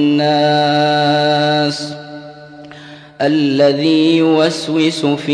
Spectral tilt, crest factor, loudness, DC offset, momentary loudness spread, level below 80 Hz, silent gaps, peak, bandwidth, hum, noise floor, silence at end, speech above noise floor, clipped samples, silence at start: -5.5 dB/octave; 12 dB; -13 LUFS; under 0.1%; 17 LU; -62 dBFS; none; -2 dBFS; 10.5 kHz; none; -36 dBFS; 0 s; 23 dB; under 0.1%; 0 s